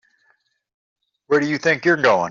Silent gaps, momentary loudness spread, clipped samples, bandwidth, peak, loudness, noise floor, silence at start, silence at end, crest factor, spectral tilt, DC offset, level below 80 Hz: none; 4 LU; under 0.1%; 7.4 kHz; -4 dBFS; -18 LUFS; -65 dBFS; 1.3 s; 0 s; 18 dB; -3.5 dB/octave; under 0.1%; -64 dBFS